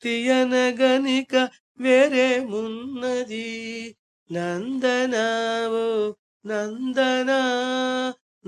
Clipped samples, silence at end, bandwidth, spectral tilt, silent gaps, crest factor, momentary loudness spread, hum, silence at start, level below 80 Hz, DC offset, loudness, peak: under 0.1%; 0.35 s; 10 kHz; -3.5 dB/octave; 1.60-1.75 s, 3.99-4.26 s, 6.19-6.40 s; 18 dB; 12 LU; none; 0 s; -72 dBFS; under 0.1%; -23 LUFS; -4 dBFS